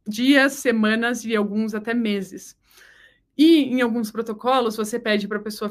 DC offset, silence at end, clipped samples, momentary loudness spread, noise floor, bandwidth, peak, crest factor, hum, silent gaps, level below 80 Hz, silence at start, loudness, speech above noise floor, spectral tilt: under 0.1%; 0 s; under 0.1%; 12 LU; -54 dBFS; 15.5 kHz; -2 dBFS; 18 dB; none; none; -66 dBFS; 0.05 s; -21 LUFS; 33 dB; -4.5 dB/octave